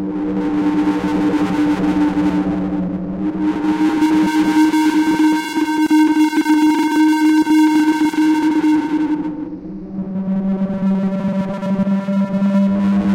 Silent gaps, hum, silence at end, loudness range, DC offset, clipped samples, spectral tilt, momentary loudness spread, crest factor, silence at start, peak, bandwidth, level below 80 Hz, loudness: none; none; 0 s; 5 LU; under 0.1%; under 0.1%; -6.5 dB/octave; 8 LU; 8 dB; 0 s; -8 dBFS; 14.5 kHz; -46 dBFS; -16 LUFS